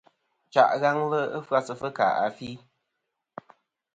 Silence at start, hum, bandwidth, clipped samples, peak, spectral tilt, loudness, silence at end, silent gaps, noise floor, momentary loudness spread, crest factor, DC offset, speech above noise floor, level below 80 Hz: 0.55 s; none; 9 kHz; under 0.1%; -4 dBFS; -5.5 dB/octave; -25 LUFS; 1.4 s; none; -82 dBFS; 25 LU; 22 dB; under 0.1%; 57 dB; -70 dBFS